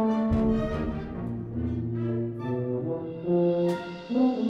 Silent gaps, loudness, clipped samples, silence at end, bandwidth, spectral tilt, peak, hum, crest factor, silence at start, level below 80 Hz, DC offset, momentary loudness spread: none; -28 LUFS; under 0.1%; 0 s; 7.8 kHz; -9.5 dB/octave; -12 dBFS; none; 14 dB; 0 s; -42 dBFS; under 0.1%; 9 LU